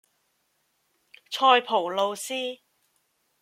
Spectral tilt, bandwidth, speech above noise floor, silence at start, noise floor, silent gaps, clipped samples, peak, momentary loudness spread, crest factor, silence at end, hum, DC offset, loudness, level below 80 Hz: -1.5 dB/octave; 16 kHz; 49 dB; 1.3 s; -72 dBFS; none; under 0.1%; -4 dBFS; 15 LU; 24 dB; 0.85 s; none; under 0.1%; -24 LUFS; -86 dBFS